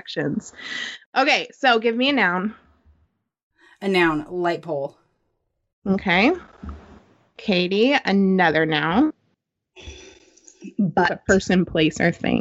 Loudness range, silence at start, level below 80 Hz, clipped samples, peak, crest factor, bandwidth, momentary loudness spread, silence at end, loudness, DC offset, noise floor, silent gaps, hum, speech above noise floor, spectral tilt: 5 LU; 0.05 s; -50 dBFS; under 0.1%; -4 dBFS; 18 dB; 8.2 kHz; 14 LU; 0 s; -20 LUFS; under 0.1%; -73 dBFS; 1.06-1.13 s, 3.43-3.51 s, 5.73-5.82 s; none; 53 dB; -5.5 dB/octave